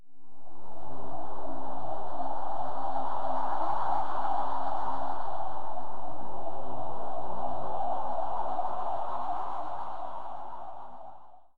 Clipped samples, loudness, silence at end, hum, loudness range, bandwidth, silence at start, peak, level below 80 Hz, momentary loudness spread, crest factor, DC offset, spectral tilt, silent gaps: under 0.1%; -35 LUFS; 0 s; none; 4 LU; 8.4 kHz; 0 s; -14 dBFS; -60 dBFS; 12 LU; 12 dB; 9%; -7.5 dB/octave; none